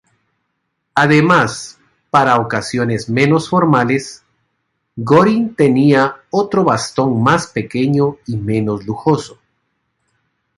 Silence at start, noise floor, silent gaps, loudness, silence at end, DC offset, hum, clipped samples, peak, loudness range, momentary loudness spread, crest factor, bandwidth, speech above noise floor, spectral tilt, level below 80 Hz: 0.95 s; -71 dBFS; none; -14 LUFS; 1.25 s; under 0.1%; none; under 0.1%; 0 dBFS; 3 LU; 10 LU; 16 dB; 11.5 kHz; 57 dB; -6 dB/octave; -52 dBFS